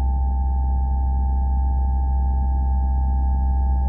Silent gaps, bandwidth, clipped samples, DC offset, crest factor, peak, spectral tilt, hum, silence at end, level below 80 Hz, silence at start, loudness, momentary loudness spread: none; 1.8 kHz; under 0.1%; under 0.1%; 6 dB; -14 dBFS; -13.5 dB/octave; none; 0 s; -20 dBFS; 0 s; -22 LUFS; 1 LU